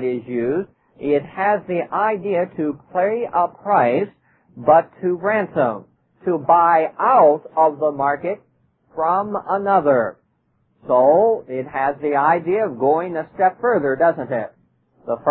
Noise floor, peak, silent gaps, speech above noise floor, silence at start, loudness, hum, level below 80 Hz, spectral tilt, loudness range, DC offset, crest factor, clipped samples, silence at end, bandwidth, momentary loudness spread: -65 dBFS; -2 dBFS; none; 47 dB; 0 s; -19 LUFS; none; -64 dBFS; -11.5 dB/octave; 3 LU; under 0.1%; 18 dB; under 0.1%; 0 s; 4.2 kHz; 12 LU